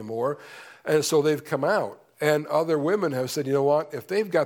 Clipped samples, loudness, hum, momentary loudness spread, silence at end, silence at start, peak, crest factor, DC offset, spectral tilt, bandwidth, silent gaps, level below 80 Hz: under 0.1%; -25 LUFS; none; 7 LU; 0 s; 0 s; -8 dBFS; 18 dB; under 0.1%; -5 dB/octave; 19 kHz; none; -76 dBFS